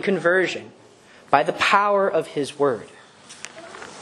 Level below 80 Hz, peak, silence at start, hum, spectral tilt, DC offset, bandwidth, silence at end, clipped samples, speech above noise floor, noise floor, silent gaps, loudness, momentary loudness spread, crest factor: -68 dBFS; 0 dBFS; 0 s; none; -4.5 dB/octave; under 0.1%; 12 kHz; 0 s; under 0.1%; 29 dB; -49 dBFS; none; -20 LUFS; 20 LU; 22 dB